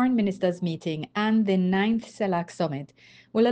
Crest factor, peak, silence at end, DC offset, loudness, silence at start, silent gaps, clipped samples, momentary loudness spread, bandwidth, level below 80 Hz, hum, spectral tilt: 14 dB; -10 dBFS; 0 s; under 0.1%; -26 LUFS; 0 s; none; under 0.1%; 8 LU; 9 kHz; -66 dBFS; none; -7 dB/octave